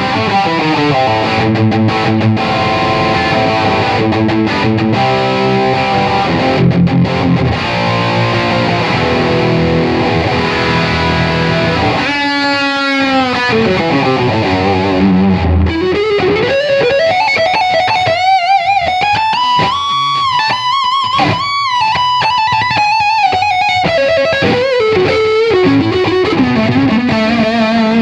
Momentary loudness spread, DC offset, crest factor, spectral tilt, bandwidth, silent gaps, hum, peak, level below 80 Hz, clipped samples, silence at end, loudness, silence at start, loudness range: 2 LU; under 0.1%; 12 dB; -6 dB/octave; 10.5 kHz; none; none; 0 dBFS; -34 dBFS; under 0.1%; 0 s; -11 LUFS; 0 s; 1 LU